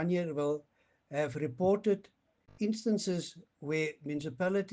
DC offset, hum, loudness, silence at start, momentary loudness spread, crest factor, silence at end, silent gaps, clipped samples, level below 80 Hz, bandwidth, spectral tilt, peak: under 0.1%; none; -34 LUFS; 0 s; 9 LU; 16 dB; 0 s; none; under 0.1%; -72 dBFS; 9.6 kHz; -6 dB/octave; -18 dBFS